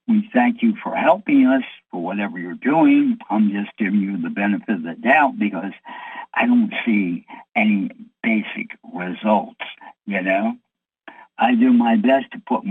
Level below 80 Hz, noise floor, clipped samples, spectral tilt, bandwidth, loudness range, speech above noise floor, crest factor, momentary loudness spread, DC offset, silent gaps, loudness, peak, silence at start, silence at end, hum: -72 dBFS; -47 dBFS; under 0.1%; -8.5 dB/octave; 3.9 kHz; 5 LU; 28 dB; 18 dB; 15 LU; under 0.1%; none; -19 LUFS; -2 dBFS; 0.1 s; 0 s; none